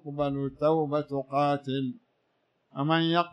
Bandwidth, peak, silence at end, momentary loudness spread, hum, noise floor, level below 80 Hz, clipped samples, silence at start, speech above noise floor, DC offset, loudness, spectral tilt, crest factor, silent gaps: 9 kHz; -12 dBFS; 0 s; 8 LU; none; -74 dBFS; -64 dBFS; under 0.1%; 0.05 s; 46 dB; under 0.1%; -28 LUFS; -8 dB/octave; 18 dB; none